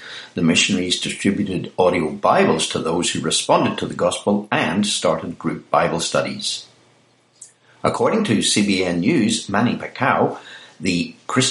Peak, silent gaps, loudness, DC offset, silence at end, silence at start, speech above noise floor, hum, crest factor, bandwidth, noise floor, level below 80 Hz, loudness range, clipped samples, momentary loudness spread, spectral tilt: -2 dBFS; none; -19 LUFS; under 0.1%; 0 s; 0 s; 38 dB; none; 18 dB; 11.5 kHz; -57 dBFS; -56 dBFS; 3 LU; under 0.1%; 8 LU; -4 dB/octave